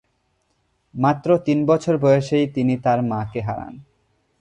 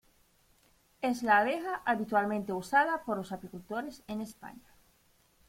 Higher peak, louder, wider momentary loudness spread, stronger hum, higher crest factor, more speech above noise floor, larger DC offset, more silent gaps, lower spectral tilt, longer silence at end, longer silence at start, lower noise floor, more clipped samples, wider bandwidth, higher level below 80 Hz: first, -4 dBFS vs -12 dBFS; first, -20 LUFS vs -31 LUFS; second, 12 LU vs 16 LU; neither; about the same, 18 dB vs 20 dB; first, 49 dB vs 36 dB; neither; neither; first, -8 dB/octave vs -5 dB/octave; second, 0.6 s vs 0.9 s; about the same, 0.95 s vs 1 s; about the same, -68 dBFS vs -68 dBFS; neither; second, 9.8 kHz vs 16.5 kHz; first, -54 dBFS vs -68 dBFS